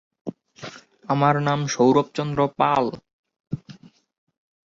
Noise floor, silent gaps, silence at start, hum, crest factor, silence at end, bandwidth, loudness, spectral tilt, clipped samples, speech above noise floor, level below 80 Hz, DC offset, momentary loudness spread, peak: -47 dBFS; 3.13-3.24 s, 3.40-3.44 s; 0.25 s; none; 20 dB; 1 s; 7.6 kHz; -21 LUFS; -6 dB/octave; under 0.1%; 27 dB; -60 dBFS; under 0.1%; 21 LU; -4 dBFS